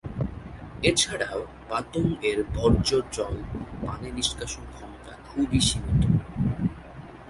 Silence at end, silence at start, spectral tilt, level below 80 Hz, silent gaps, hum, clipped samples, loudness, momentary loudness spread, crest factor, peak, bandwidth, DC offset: 0 s; 0.05 s; -4.5 dB/octave; -38 dBFS; none; none; under 0.1%; -26 LUFS; 18 LU; 20 dB; -8 dBFS; 11.5 kHz; under 0.1%